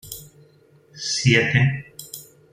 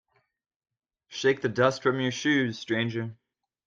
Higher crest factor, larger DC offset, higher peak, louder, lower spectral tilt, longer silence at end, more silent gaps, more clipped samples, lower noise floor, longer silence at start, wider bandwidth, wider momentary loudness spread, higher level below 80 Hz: about the same, 22 dB vs 20 dB; neither; first, -2 dBFS vs -8 dBFS; first, -19 LUFS vs -27 LUFS; about the same, -4.5 dB/octave vs -5 dB/octave; second, 0.3 s vs 0.55 s; neither; neither; second, -54 dBFS vs -78 dBFS; second, 0.05 s vs 1.1 s; first, 16 kHz vs 7.6 kHz; first, 21 LU vs 10 LU; first, -58 dBFS vs -70 dBFS